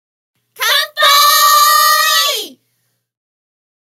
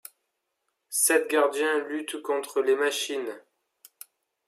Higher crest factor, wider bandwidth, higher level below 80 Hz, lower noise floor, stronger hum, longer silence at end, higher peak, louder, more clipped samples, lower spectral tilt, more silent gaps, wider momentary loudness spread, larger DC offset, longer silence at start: second, 14 dB vs 20 dB; about the same, 16.5 kHz vs 15.5 kHz; first, -78 dBFS vs -90 dBFS; second, -66 dBFS vs -80 dBFS; neither; first, 1.5 s vs 1.1 s; first, 0 dBFS vs -8 dBFS; first, -9 LUFS vs -26 LUFS; neither; second, 4 dB/octave vs 0 dB/octave; neither; about the same, 11 LU vs 11 LU; neither; second, 0.6 s vs 0.9 s